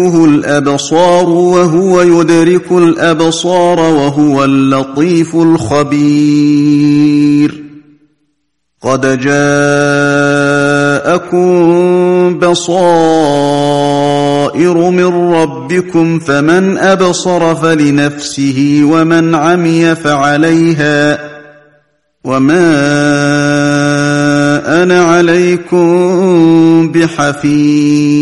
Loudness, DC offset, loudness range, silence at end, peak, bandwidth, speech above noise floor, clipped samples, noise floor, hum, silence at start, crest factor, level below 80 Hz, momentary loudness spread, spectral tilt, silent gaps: -9 LUFS; 0.6%; 3 LU; 0 s; 0 dBFS; 11.5 kHz; 58 dB; under 0.1%; -65 dBFS; none; 0 s; 8 dB; -46 dBFS; 4 LU; -6 dB/octave; none